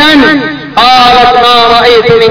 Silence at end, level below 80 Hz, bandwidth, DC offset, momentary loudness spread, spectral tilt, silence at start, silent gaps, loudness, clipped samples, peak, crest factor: 0 s; -32 dBFS; 5.4 kHz; under 0.1%; 5 LU; -4.5 dB/octave; 0 s; none; -4 LUFS; 10%; 0 dBFS; 4 dB